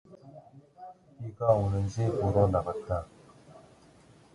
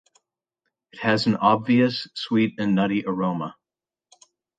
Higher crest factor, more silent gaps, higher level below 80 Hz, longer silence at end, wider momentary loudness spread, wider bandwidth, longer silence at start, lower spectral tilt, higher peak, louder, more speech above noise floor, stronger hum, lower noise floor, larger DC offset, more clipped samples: about the same, 22 dB vs 20 dB; neither; first, -48 dBFS vs -64 dBFS; second, 0.75 s vs 1.05 s; first, 24 LU vs 9 LU; first, 11 kHz vs 9.2 kHz; second, 0.1 s vs 0.95 s; first, -8.5 dB/octave vs -6.5 dB/octave; second, -10 dBFS vs -4 dBFS; second, -29 LUFS vs -22 LUFS; second, 30 dB vs over 68 dB; neither; second, -57 dBFS vs under -90 dBFS; neither; neither